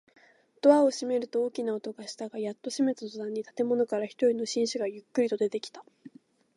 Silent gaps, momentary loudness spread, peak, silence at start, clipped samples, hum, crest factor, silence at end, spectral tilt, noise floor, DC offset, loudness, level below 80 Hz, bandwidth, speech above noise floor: none; 13 LU; -8 dBFS; 0.65 s; under 0.1%; none; 22 dB; 0.5 s; -4.5 dB/octave; -54 dBFS; under 0.1%; -29 LUFS; -86 dBFS; 11.5 kHz; 25 dB